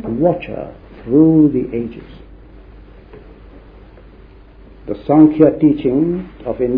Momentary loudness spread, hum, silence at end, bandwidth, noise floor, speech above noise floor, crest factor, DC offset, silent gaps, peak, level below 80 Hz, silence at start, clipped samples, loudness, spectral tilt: 20 LU; none; 0 s; 4 kHz; -41 dBFS; 27 dB; 16 dB; under 0.1%; none; 0 dBFS; -40 dBFS; 0 s; under 0.1%; -14 LUFS; -12.5 dB/octave